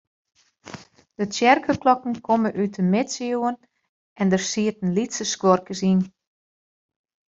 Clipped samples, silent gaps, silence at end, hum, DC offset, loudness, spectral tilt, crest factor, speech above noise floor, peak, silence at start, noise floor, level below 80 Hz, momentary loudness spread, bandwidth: under 0.1%; 3.89-4.16 s; 1.3 s; none; under 0.1%; -22 LUFS; -5 dB/octave; 22 dB; 22 dB; -2 dBFS; 0.65 s; -43 dBFS; -64 dBFS; 14 LU; 7.8 kHz